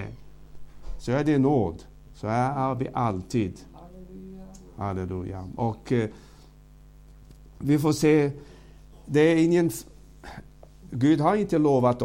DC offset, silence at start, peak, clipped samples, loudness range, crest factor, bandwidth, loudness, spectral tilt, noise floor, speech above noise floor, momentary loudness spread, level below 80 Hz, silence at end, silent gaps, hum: under 0.1%; 0 s; -8 dBFS; under 0.1%; 8 LU; 18 dB; 16.5 kHz; -25 LUFS; -7 dB/octave; -50 dBFS; 27 dB; 23 LU; -48 dBFS; 0 s; none; 50 Hz at -50 dBFS